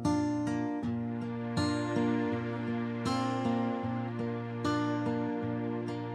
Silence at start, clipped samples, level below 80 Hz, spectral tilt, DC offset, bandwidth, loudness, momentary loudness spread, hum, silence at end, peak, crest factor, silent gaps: 0 s; under 0.1%; -68 dBFS; -6.5 dB/octave; under 0.1%; 11.5 kHz; -33 LUFS; 5 LU; none; 0 s; -18 dBFS; 14 dB; none